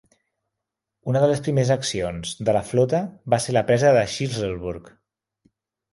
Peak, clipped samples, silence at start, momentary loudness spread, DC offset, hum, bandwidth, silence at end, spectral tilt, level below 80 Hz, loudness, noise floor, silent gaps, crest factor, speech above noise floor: -4 dBFS; under 0.1%; 1.05 s; 10 LU; under 0.1%; none; 11.5 kHz; 1.05 s; -5.5 dB/octave; -50 dBFS; -22 LUFS; -84 dBFS; none; 20 dB; 62 dB